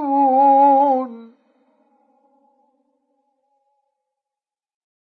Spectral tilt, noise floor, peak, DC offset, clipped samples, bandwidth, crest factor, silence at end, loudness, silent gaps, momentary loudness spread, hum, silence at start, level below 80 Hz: -8 dB/octave; -89 dBFS; -4 dBFS; under 0.1%; under 0.1%; 4.4 kHz; 16 dB; 3.8 s; -14 LUFS; none; 10 LU; none; 0 s; under -90 dBFS